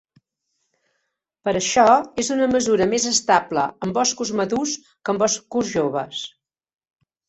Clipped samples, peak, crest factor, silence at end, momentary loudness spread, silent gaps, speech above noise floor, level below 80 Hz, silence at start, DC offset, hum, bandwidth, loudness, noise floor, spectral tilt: under 0.1%; -2 dBFS; 20 dB; 1 s; 11 LU; none; 55 dB; -58 dBFS; 1.45 s; under 0.1%; none; 8.4 kHz; -20 LUFS; -76 dBFS; -3 dB/octave